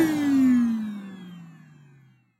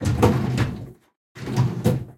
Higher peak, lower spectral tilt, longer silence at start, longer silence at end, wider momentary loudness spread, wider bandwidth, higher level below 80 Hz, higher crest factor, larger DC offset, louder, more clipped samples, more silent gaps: second, -10 dBFS vs -2 dBFS; about the same, -6 dB/octave vs -7 dB/octave; about the same, 0 s vs 0 s; first, 0.9 s vs 0.05 s; first, 23 LU vs 17 LU; about the same, 15 kHz vs 16 kHz; second, -68 dBFS vs -40 dBFS; second, 14 dB vs 20 dB; neither; about the same, -22 LUFS vs -23 LUFS; neither; second, none vs 1.16-1.35 s